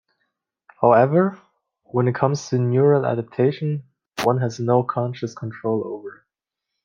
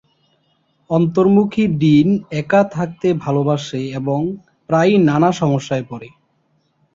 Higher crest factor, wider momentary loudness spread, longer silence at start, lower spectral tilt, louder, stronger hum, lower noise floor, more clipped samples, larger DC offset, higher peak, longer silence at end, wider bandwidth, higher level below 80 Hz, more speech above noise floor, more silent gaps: first, 20 dB vs 14 dB; first, 14 LU vs 11 LU; about the same, 0.8 s vs 0.9 s; about the same, -7.5 dB/octave vs -7.5 dB/octave; second, -21 LUFS vs -16 LUFS; neither; first, -83 dBFS vs -63 dBFS; neither; neither; about the same, -2 dBFS vs -2 dBFS; second, 0.7 s vs 0.85 s; first, 14.5 kHz vs 7.6 kHz; second, -66 dBFS vs -54 dBFS; first, 64 dB vs 47 dB; neither